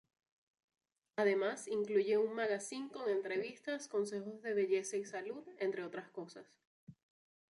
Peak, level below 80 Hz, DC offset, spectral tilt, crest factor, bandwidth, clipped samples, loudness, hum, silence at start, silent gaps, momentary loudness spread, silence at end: -20 dBFS; -88 dBFS; under 0.1%; -4 dB/octave; 20 dB; 11.5 kHz; under 0.1%; -38 LUFS; none; 1.15 s; 6.67-6.87 s; 13 LU; 0.6 s